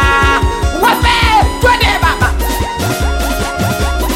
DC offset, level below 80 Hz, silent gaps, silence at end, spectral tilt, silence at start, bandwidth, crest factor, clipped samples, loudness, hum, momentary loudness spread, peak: under 0.1%; -18 dBFS; none; 0 s; -4 dB/octave; 0 s; 17 kHz; 10 dB; under 0.1%; -12 LUFS; none; 6 LU; 0 dBFS